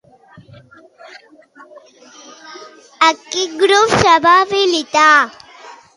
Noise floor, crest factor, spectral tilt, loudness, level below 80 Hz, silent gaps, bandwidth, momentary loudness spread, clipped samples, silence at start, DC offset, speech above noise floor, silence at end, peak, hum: -44 dBFS; 16 dB; -3 dB/octave; -12 LUFS; -48 dBFS; none; 11.5 kHz; 15 LU; under 0.1%; 2.5 s; under 0.1%; 32 dB; 0.25 s; 0 dBFS; none